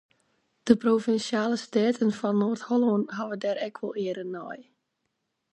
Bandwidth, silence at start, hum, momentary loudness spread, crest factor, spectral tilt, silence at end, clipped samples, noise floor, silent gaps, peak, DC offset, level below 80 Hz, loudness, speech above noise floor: 9 kHz; 0.65 s; none; 12 LU; 22 dB; -6 dB/octave; 0.9 s; under 0.1%; -79 dBFS; none; -4 dBFS; under 0.1%; -70 dBFS; -27 LUFS; 53 dB